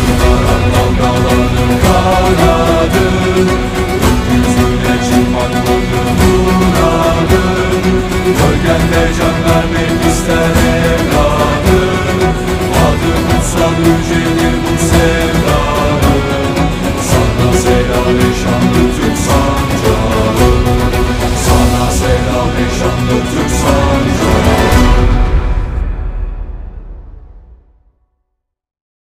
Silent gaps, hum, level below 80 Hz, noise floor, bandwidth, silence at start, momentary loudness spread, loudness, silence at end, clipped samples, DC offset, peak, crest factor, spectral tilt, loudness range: none; none; -18 dBFS; -70 dBFS; 16.5 kHz; 0 s; 4 LU; -11 LUFS; 1.5 s; under 0.1%; under 0.1%; 0 dBFS; 10 dB; -5.5 dB/octave; 2 LU